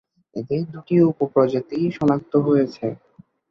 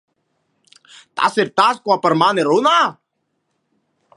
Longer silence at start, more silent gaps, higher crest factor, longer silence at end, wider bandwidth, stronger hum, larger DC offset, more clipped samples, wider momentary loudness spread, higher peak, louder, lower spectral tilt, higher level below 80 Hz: second, 0.35 s vs 1.15 s; neither; about the same, 16 dB vs 18 dB; second, 0.55 s vs 1.25 s; second, 7 kHz vs 11.5 kHz; neither; neither; neither; first, 12 LU vs 6 LU; second, -4 dBFS vs 0 dBFS; second, -21 LUFS vs -16 LUFS; first, -9.5 dB/octave vs -4.5 dB/octave; first, -60 dBFS vs -70 dBFS